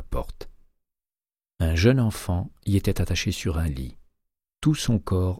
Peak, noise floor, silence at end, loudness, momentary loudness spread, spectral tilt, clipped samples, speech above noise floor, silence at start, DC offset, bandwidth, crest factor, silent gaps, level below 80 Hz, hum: -6 dBFS; under -90 dBFS; 0 s; -25 LUFS; 14 LU; -6 dB/octave; under 0.1%; over 67 dB; 0 s; under 0.1%; 16 kHz; 20 dB; none; -36 dBFS; none